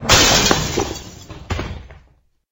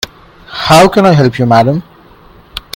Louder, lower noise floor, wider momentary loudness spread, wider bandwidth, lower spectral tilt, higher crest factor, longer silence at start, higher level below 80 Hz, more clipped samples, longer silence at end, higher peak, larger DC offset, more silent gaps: second, -16 LUFS vs -8 LUFS; first, -55 dBFS vs -39 dBFS; first, 26 LU vs 20 LU; about the same, 17.5 kHz vs 18 kHz; second, -2.5 dB/octave vs -5.5 dB/octave; first, 18 dB vs 10 dB; second, 0 s vs 0.5 s; first, -32 dBFS vs -38 dBFS; second, under 0.1% vs 1%; first, 0.6 s vs 0.15 s; about the same, 0 dBFS vs 0 dBFS; neither; neither